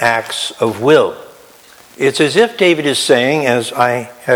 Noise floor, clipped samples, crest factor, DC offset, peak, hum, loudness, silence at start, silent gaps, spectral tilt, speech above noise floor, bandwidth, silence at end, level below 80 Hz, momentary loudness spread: -42 dBFS; under 0.1%; 14 dB; under 0.1%; 0 dBFS; none; -13 LUFS; 0 s; none; -4 dB/octave; 29 dB; 19.5 kHz; 0 s; -60 dBFS; 8 LU